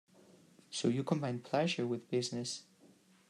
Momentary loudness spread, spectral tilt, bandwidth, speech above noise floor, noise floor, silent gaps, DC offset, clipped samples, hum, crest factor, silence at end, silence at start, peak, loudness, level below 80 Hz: 8 LU; -5 dB/octave; 12.5 kHz; 29 dB; -65 dBFS; none; under 0.1%; under 0.1%; none; 20 dB; 0.45 s; 0.7 s; -18 dBFS; -36 LUFS; -84 dBFS